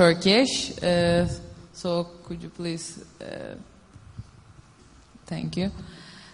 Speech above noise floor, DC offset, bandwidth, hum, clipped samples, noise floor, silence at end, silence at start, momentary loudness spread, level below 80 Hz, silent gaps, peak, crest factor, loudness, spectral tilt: 28 dB; under 0.1%; 10.5 kHz; none; under 0.1%; -53 dBFS; 0.05 s; 0 s; 25 LU; -48 dBFS; none; -4 dBFS; 22 dB; -25 LUFS; -5 dB/octave